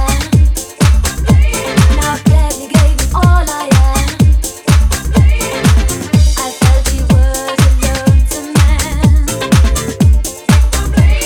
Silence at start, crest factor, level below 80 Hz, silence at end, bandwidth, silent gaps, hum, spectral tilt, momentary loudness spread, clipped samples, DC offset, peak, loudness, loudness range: 0 s; 10 dB; -12 dBFS; 0 s; 19 kHz; none; none; -5 dB/octave; 2 LU; under 0.1%; under 0.1%; 0 dBFS; -12 LUFS; 0 LU